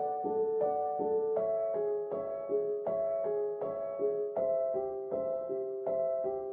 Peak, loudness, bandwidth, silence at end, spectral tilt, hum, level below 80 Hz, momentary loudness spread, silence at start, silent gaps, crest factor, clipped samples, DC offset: -20 dBFS; -33 LUFS; 2.4 kHz; 0 s; -8.5 dB/octave; none; -72 dBFS; 5 LU; 0 s; none; 12 dB; under 0.1%; under 0.1%